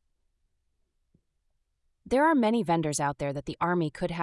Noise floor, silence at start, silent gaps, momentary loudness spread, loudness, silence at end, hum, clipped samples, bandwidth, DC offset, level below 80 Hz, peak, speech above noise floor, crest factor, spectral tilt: -75 dBFS; 2.05 s; none; 8 LU; -27 LUFS; 0 s; none; under 0.1%; 12 kHz; under 0.1%; -58 dBFS; -12 dBFS; 48 dB; 16 dB; -5.5 dB/octave